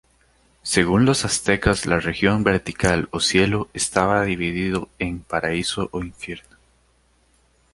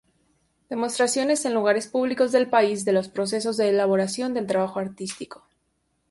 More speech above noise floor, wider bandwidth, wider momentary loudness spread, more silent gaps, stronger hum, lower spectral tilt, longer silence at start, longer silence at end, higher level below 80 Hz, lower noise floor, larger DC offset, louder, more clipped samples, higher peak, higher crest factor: second, 40 dB vs 49 dB; about the same, 11.5 kHz vs 11.5 kHz; about the same, 11 LU vs 11 LU; neither; neither; about the same, -4.5 dB/octave vs -4 dB/octave; about the same, 0.65 s vs 0.7 s; first, 1.35 s vs 0.75 s; first, -40 dBFS vs -68 dBFS; second, -61 dBFS vs -72 dBFS; neither; about the same, -21 LUFS vs -23 LUFS; neither; first, -2 dBFS vs -6 dBFS; about the same, 20 dB vs 18 dB